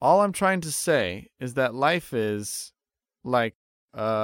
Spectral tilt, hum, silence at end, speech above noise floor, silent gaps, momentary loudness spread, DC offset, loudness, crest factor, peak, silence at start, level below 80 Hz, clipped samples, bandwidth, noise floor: -4 dB/octave; none; 0 s; 29 dB; 3.55-3.88 s; 13 LU; under 0.1%; -25 LUFS; 18 dB; -8 dBFS; 0 s; -62 dBFS; under 0.1%; 17 kHz; -54 dBFS